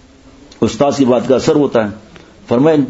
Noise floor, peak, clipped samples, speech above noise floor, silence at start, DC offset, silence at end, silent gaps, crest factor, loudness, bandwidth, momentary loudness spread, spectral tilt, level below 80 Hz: -41 dBFS; 0 dBFS; under 0.1%; 29 dB; 0.6 s; under 0.1%; 0 s; none; 14 dB; -14 LUFS; 8 kHz; 7 LU; -6.5 dB/octave; -46 dBFS